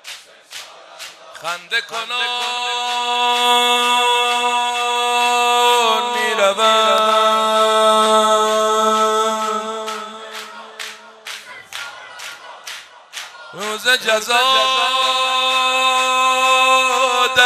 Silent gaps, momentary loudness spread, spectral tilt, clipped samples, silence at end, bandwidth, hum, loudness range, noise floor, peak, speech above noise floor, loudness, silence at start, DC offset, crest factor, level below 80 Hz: none; 19 LU; 0 dB/octave; under 0.1%; 0 s; 14.5 kHz; none; 13 LU; -37 dBFS; 0 dBFS; 20 dB; -15 LUFS; 0.05 s; under 0.1%; 18 dB; -72 dBFS